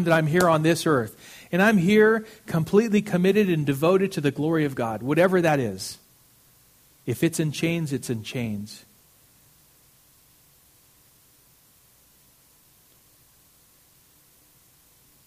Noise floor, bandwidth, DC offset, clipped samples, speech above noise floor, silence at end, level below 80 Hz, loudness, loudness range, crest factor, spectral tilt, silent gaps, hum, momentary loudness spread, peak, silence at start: -58 dBFS; 15.5 kHz; under 0.1%; under 0.1%; 36 dB; 6.5 s; -60 dBFS; -23 LUFS; 12 LU; 20 dB; -6 dB/octave; none; none; 15 LU; -6 dBFS; 0 s